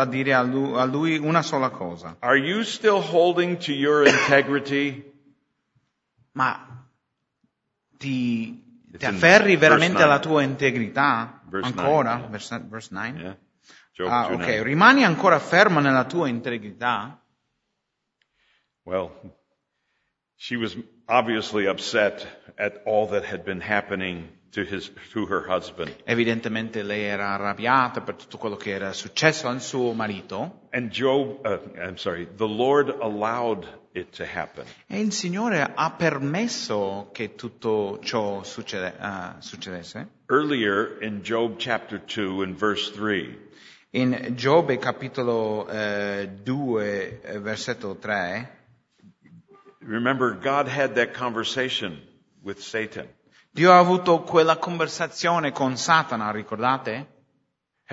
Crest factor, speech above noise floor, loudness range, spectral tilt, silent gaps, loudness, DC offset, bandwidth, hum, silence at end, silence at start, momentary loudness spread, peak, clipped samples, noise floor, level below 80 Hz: 24 dB; 56 dB; 10 LU; -5 dB/octave; none; -23 LUFS; under 0.1%; 8 kHz; none; 0 s; 0 s; 16 LU; 0 dBFS; under 0.1%; -79 dBFS; -64 dBFS